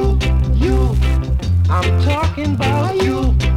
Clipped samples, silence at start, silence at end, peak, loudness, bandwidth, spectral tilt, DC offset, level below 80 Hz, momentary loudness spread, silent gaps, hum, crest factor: under 0.1%; 0 s; 0 s; -4 dBFS; -16 LUFS; 11 kHz; -7 dB/octave; under 0.1%; -18 dBFS; 3 LU; none; none; 12 dB